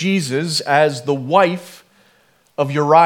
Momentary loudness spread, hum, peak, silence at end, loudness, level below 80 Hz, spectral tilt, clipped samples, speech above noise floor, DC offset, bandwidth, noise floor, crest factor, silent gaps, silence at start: 9 LU; none; 0 dBFS; 0 s; -17 LUFS; -72 dBFS; -5 dB/octave; under 0.1%; 41 dB; under 0.1%; 17 kHz; -56 dBFS; 16 dB; none; 0 s